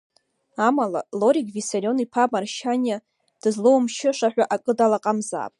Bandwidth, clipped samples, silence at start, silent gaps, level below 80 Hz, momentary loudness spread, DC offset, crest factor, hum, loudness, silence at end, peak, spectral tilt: 11.5 kHz; under 0.1%; 0.6 s; none; -76 dBFS; 7 LU; under 0.1%; 16 dB; none; -22 LUFS; 0.1 s; -6 dBFS; -4.5 dB/octave